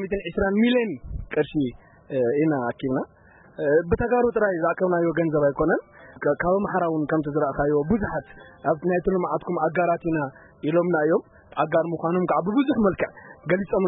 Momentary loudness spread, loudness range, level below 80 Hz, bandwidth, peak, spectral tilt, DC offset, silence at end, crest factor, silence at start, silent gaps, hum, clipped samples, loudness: 8 LU; 2 LU; -46 dBFS; 4 kHz; -8 dBFS; -11.5 dB/octave; under 0.1%; 0 s; 14 dB; 0 s; none; none; under 0.1%; -24 LUFS